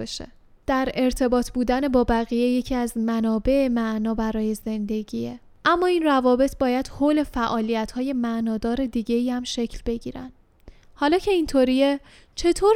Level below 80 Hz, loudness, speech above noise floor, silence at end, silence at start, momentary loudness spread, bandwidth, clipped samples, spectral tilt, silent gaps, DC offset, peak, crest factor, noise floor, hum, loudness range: -40 dBFS; -23 LUFS; 27 dB; 0 s; 0 s; 11 LU; 15.5 kHz; under 0.1%; -5 dB/octave; none; under 0.1%; -6 dBFS; 16 dB; -49 dBFS; none; 3 LU